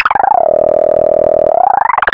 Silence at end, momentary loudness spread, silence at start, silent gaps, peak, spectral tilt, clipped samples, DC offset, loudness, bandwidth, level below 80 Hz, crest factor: 0 s; 1 LU; 0 s; none; 0 dBFS; -7 dB/octave; under 0.1%; under 0.1%; -10 LUFS; 5.2 kHz; -42 dBFS; 10 dB